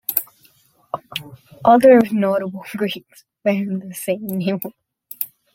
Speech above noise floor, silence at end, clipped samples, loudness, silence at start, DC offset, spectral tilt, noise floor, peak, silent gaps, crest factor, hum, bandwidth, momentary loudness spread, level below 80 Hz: 38 dB; 0.3 s; under 0.1%; -19 LUFS; 0.1 s; under 0.1%; -6 dB/octave; -56 dBFS; 0 dBFS; none; 20 dB; none; 17 kHz; 20 LU; -62 dBFS